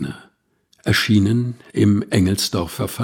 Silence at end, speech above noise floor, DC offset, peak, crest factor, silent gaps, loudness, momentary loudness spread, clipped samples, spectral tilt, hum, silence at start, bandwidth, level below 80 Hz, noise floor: 0 s; 44 dB; under 0.1%; -2 dBFS; 16 dB; none; -19 LUFS; 12 LU; under 0.1%; -5.5 dB/octave; none; 0 s; 17.5 kHz; -46 dBFS; -62 dBFS